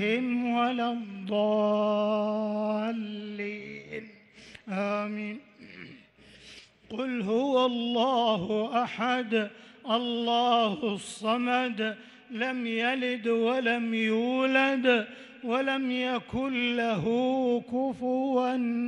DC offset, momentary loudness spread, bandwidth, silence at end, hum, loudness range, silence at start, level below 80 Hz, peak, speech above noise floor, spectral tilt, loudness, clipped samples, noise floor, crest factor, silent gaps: under 0.1%; 15 LU; 11 kHz; 0 s; none; 8 LU; 0 s; -68 dBFS; -12 dBFS; 27 dB; -5.5 dB/octave; -28 LUFS; under 0.1%; -55 dBFS; 16 dB; none